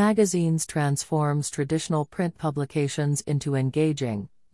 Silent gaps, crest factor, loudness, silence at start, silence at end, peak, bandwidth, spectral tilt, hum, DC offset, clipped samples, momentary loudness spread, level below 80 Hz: none; 16 dB; -26 LUFS; 0 s; 0.25 s; -10 dBFS; 12 kHz; -6 dB/octave; none; 0.1%; under 0.1%; 6 LU; -60 dBFS